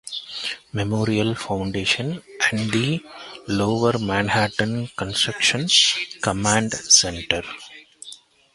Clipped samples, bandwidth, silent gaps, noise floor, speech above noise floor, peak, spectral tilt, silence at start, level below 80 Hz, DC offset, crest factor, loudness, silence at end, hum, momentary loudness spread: under 0.1%; 11.5 kHz; none; -45 dBFS; 23 dB; 0 dBFS; -3 dB/octave; 0.05 s; -48 dBFS; under 0.1%; 22 dB; -20 LUFS; 0.4 s; none; 16 LU